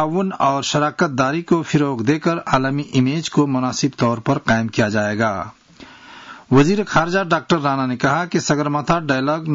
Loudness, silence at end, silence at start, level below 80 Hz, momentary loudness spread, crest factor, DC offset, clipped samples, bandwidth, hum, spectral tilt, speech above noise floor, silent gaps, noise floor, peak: -18 LUFS; 0 s; 0 s; -50 dBFS; 3 LU; 14 dB; under 0.1%; under 0.1%; 7.8 kHz; none; -5.5 dB/octave; 25 dB; none; -43 dBFS; -4 dBFS